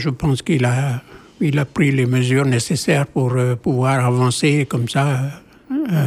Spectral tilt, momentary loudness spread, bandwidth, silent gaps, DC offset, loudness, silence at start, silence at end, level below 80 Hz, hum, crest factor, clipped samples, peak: -6 dB/octave; 7 LU; 14 kHz; none; under 0.1%; -18 LUFS; 0 s; 0 s; -48 dBFS; none; 14 dB; under 0.1%; -4 dBFS